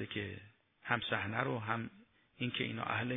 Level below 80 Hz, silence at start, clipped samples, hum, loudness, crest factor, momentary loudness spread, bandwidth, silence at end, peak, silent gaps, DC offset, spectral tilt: -72 dBFS; 0 s; under 0.1%; none; -38 LUFS; 22 dB; 12 LU; 3.9 kHz; 0 s; -16 dBFS; none; under 0.1%; -8.5 dB/octave